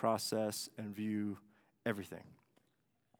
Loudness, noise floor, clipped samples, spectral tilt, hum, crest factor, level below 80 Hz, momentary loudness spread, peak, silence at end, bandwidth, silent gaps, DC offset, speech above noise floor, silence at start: -40 LUFS; -80 dBFS; under 0.1%; -4.5 dB/octave; none; 22 dB; -84 dBFS; 15 LU; -20 dBFS; 0.85 s; 18.5 kHz; none; under 0.1%; 41 dB; 0 s